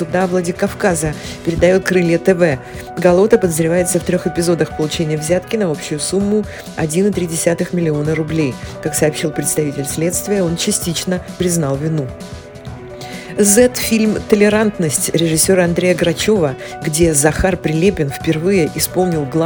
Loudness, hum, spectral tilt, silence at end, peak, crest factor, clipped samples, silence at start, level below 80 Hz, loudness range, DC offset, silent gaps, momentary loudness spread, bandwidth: -15 LUFS; none; -4.5 dB/octave; 0 s; 0 dBFS; 16 dB; under 0.1%; 0 s; -38 dBFS; 4 LU; under 0.1%; none; 10 LU; 19 kHz